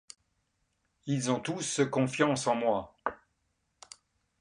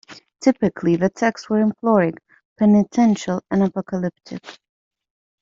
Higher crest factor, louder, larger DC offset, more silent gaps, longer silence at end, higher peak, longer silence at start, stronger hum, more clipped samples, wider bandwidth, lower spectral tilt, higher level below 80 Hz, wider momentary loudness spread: about the same, 20 dB vs 16 dB; second, -30 LUFS vs -19 LUFS; neither; second, none vs 2.45-2.56 s; first, 1.25 s vs 0.9 s; second, -14 dBFS vs -4 dBFS; first, 1.05 s vs 0.1 s; neither; neither; first, 11.5 kHz vs 7.6 kHz; second, -4.5 dB/octave vs -7 dB/octave; second, -68 dBFS vs -58 dBFS; first, 20 LU vs 10 LU